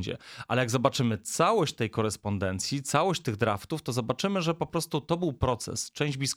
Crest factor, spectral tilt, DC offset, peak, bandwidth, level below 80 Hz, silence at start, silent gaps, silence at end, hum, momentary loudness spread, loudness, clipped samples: 20 dB; -4.5 dB/octave; under 0.1%; -8 dBFS; 17 kHz; -52 dBFS; 0 s; none; 0 s; none; 6 LU; -29 LUFS; under 0.1%